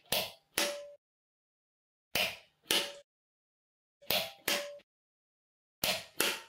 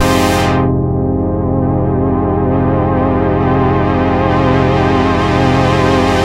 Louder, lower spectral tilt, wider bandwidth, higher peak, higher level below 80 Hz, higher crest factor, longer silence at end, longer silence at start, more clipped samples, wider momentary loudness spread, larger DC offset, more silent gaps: second, -33 LUFS vs -13 LUFS; second, -0.5 dB/octave vs -7 dB/octave; about the same, 16 kHz vs 16 kHz; second, -10 dBFS vs 0 dBFS; second, -70 dBFS vs -26 dBFS; first, 28 dB vs 12 dB; about the same, 0 s vs 0 s; about the same, 0.1 s vs 0 s; neither; first, 15 LU vs 3 LU; neither; first, 0.98-2.11 s, 3.04-4.00 s, 4.83-5.82 s vs none